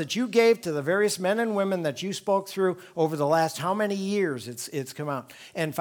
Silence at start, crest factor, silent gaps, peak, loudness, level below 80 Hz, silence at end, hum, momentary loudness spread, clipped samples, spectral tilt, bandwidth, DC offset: 0 s; 18 dB; none; -8 dBFS; -26 LUFS; -76 dBFS; 0 s; none; 11 LU; under 0.1%; -5 dB/octave; 19.5 kHz; under 0.1%